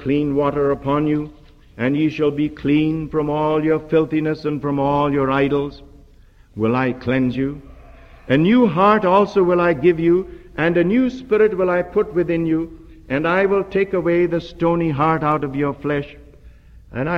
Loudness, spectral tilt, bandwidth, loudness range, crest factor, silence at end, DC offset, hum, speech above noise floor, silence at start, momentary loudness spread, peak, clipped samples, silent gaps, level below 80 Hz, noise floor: -18 LUFS; -8.5 dB/octave; 6.8 kHz; 4 LU; 16 dB; 0 s; under 0.1%; none; 30 dB; 0 s; 8 LU; -2 dBFS; under 0.1%; none; -44 dBFS; -48 dBFS